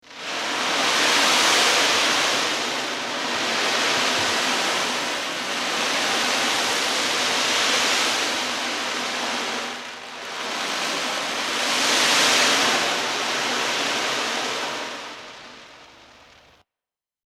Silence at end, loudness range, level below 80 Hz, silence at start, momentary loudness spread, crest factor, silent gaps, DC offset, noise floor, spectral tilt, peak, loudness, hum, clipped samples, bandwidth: 1.35 s; 6 LU; -68 dBFS; 0.05 s; 12 LU; 18 dB; none; under 0.1%; under -90 dBFS; 0 dB/octave; -6 dBFS; -20 LUFS; none; under 0.1%; 16 kHz